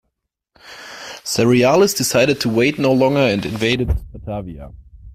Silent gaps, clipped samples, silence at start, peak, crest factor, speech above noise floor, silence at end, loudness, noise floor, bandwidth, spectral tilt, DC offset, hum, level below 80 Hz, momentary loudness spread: none; under 0.1%; 0.65 s; -2 dBFS; 16 dB; 59 dB; 0.05 s; -16 LUFS; -75 dBFS; 16 kHz; -4.5 dB/octave; under 0.1%; none; -34 dBFS; 19 LU